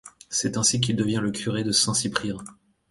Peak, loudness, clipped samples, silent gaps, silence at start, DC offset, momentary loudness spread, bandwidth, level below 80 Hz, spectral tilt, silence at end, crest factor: -6 dBFS; -24 LUFS; under 0.1%; none; 0.05 s; under 0.1%; 8 LU; 11.5 kHz; -56 dBFS; -3 dB/octave; 0.4 s; 20 dB